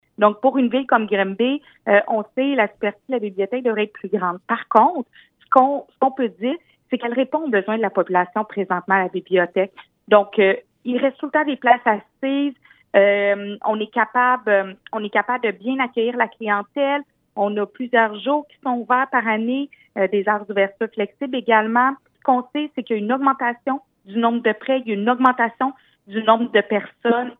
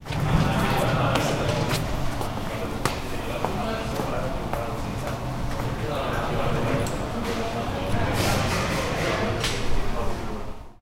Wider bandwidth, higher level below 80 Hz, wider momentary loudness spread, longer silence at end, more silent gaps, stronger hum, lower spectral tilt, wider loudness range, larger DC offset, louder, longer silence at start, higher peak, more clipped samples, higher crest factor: second, 4 kHz vs 16 kHz; second, -76 dBFS vs -34 dBFS; about the same, 9 LU vs 8 LU; about the same, 0.05 s vs 0.05 s; neither; neither; first, -8 dB/octave vs -5 dB/octave; about the same, 2 LU vs 3 LU; neither; first, -20 LUFS vs -26 LUFS; first, 0.2 s vs 0 s; first, 0 dBFS vs -4 dBFS; neither; about the same, 20 dB vs 22 dB